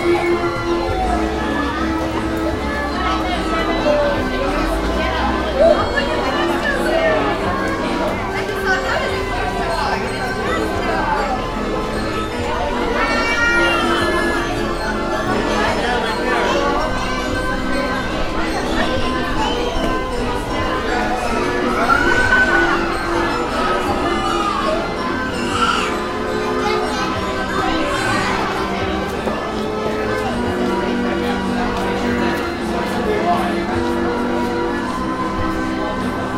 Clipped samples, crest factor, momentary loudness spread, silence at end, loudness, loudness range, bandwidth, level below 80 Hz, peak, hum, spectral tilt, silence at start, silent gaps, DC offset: under 0.1%; 16 dB; 6 LU; 0 s; -18 LUFS; 3 LU; 16 kHz; -30 dBFS; -2 dBFS; none; -5 dB/octave; 0 s; none; under 0.1%